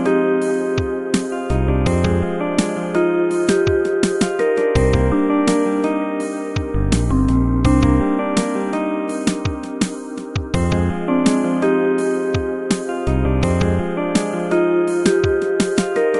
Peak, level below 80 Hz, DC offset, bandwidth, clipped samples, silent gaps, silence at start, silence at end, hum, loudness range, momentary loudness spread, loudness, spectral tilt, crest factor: -2 dBFS; -28 dBFS; under 0.1%; 11.5 kHz; under 0.1%; none; 0 s; 0 s; none; 2 LU; 6 LU; -18 LUFS; -6.5 dB/octave; 16 dB